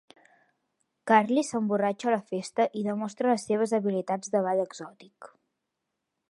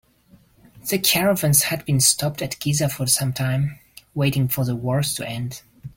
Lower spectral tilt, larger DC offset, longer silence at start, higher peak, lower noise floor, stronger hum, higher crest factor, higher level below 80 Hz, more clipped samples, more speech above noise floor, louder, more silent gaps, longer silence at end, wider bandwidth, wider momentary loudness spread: first, -5.5 dB/octave vs -3.5 dB/octave; neither; first, 1.05 s vs 0.75 s; second, -6 dBFS vs 0 dBFS; first, -83 dBFS vs -55 dBFS; neither; about the same, 22 dB vs 22 dB; second, -80 dBFS vs -52 dBFS; neither; first, 56 dB vs 34 dB; second, -27 LUFS vs -20 LUFS; neither; first, 1.05 s vs 0.1 s; second, 11.5 kHz vs 17 kHz; second, 9 LU vs 12 LU